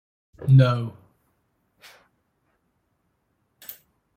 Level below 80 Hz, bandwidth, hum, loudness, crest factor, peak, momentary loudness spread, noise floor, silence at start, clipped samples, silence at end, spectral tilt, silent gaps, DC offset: -56 dBFS; 16 kHz; none; -20 LUFS; 20 dB; -6 dBFS; 24 LU; -72 dBFS; 0.4 s; under 0.1%; 0.45 s; -8.5 dB/octave; none; under 0.1%